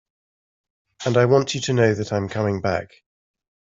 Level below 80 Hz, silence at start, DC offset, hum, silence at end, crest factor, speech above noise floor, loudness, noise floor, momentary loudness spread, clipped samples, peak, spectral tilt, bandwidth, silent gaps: -58 dBFS; 1 s; under 0.1%; none; 0.75 s; 20 dB; over 70 dB; -21 LUFS; under -90 dBFS; 8 LU; under 0.1%; -4 dBFS; -5.5 dB/octave; 7.8 kHz; none